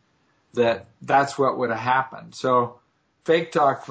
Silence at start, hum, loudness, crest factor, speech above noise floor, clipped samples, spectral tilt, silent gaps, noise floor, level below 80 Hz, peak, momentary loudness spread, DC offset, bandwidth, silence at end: 0.55 s; none; -22 LUFS; 18 dB; 43 dB; under 0.1%; -5.5 dB/octave; none; -65 dBFS; -64 dBFS; -6 dBFS; 11 LU; under 0.1%; 8 kHz; 0 s